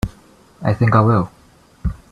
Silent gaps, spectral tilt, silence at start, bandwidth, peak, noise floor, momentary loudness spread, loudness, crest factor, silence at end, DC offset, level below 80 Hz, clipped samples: none; -9 dB/octave; 0.05 s; 9.6 kHz; 0 dBFS; -48 dBFS; 15 LU; -18 LUFS; 18 dB; 0.15 s; under 0.1%; -34 dBFS; under 0.1%